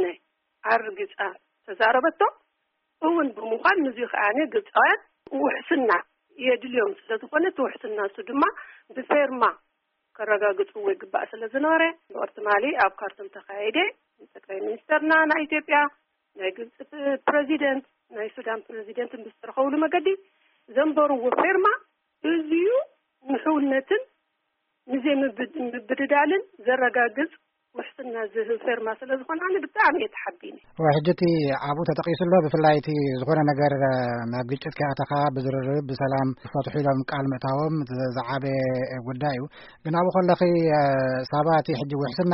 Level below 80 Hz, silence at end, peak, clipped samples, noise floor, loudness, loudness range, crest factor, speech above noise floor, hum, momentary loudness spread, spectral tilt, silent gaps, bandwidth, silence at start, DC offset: -64 dBFS; 0 s; -8 dBFS; under 0.1%; -76 dBFS; -24 LUFS; 4 LU; 16 dB; 52 dB; none; 12 LU; -4.5 dB/octave; none; 5.8 kHz; 0 s; under 0.1%